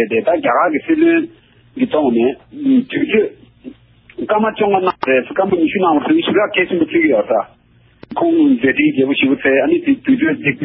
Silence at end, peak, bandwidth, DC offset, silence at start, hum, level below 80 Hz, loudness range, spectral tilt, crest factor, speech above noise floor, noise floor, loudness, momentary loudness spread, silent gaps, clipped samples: 0 s; -2 dBFS; 5.2 kHz; under 0.1%; 0 s; none; -54 dBFS; 2 LU; -11 dB/octave; 14 dB; 30 dB; -44 dBFS; -15 LUFS; 6 LU; none; under 0.1%